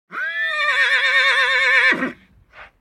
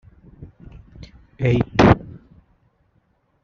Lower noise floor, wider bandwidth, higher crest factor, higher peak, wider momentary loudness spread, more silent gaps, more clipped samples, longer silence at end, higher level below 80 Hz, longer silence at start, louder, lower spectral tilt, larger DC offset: second, -46 dBFS vs -64 dBFS; first, 13.5 kHz vs 7.2 kHz; second, 16 dB vs 22 dB; about the same, -2 dBFS vs -2 dBFS; second, 8 LU vs 27 LU; neither; neither; second, 0.15 s vs 1.35 s; second, -60 dBFS vs -38 dBFS; second, 0.1 s vs 0.4 s; first, -15 LUFS vs -18 LUFS; second, -1.5 dB/octave vs -6.5 dB/octave; neither